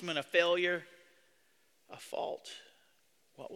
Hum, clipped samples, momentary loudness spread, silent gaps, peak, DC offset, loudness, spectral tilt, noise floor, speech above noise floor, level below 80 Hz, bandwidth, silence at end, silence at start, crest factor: none; under 0.1%; 22 LU; none; -14 dBFS; under 0.1%; -33 LUFS; -3.5 dB/octave; -73 dBFS; 38 dB; -86 dBFS; 15 kHz; 0 s; 0 s; 24 dB